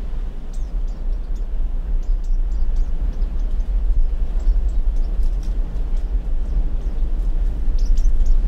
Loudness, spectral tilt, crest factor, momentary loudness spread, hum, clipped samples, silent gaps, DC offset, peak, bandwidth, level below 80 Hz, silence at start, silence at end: -26 LUFS; -7.5 dB/octave; 12 dB; 6 LU; none; under 0.1%; none; under 0.1%; -6 dBFS; 2 kHz; -18 dBFS; 0 s; 0 s